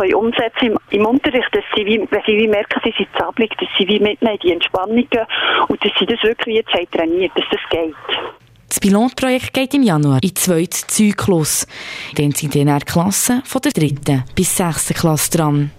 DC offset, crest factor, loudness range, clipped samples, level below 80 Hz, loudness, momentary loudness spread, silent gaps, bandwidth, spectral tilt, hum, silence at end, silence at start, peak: under 0.1%; 12 dB; 2 LU; under 0.1%; -44 dBFS; -16 LUFS; 4 LU; none; 16 kHz; -4 dB/octave; none; 0.1 s; 0 s; -4 dBFS